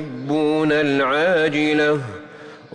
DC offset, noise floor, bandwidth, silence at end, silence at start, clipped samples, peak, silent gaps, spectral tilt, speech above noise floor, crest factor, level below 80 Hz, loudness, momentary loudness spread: under 0.1%; -40 dBFS; 10 kHz; 0.15 s; 0 s; under 0.1%; -8 dBFS; none; -6 dB/octave; 22 dB; 10 dB; -58 dBFS; -18 LUFS; 15 LU